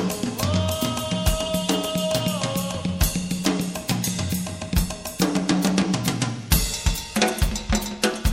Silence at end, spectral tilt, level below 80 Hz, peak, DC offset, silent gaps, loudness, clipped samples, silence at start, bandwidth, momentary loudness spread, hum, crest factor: 0 s; -4.5 dB/octave; -30 dBFS; -4 dBFS; under 0.1%; none; -24 LUFS; under 0.1%; 0 s; 16.5 kHz; 5 LU; none; 20 dB